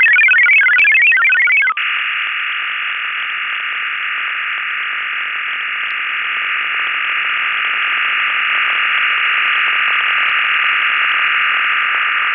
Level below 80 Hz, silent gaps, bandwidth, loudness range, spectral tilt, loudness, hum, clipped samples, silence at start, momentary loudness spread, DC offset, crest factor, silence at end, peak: -74 dBFS; none; 5.4 kHz; 6 LU; -1 dB/octave; -13 LUFS; none; under 0.1%; 0 s; 10 LU; under 0.1%; 12 dB; 0 s; -4 dBFS